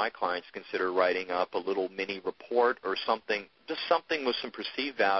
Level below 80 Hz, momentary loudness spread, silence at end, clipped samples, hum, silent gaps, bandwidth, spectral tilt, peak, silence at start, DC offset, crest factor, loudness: -74 dBFS; 8 LU; 0 s; under 0.1%; none; none; 6.2 kHz; -4.5 dB/octave; -10 dBFS; 0 s; under 0.1%; 20 dB; -31 LUFS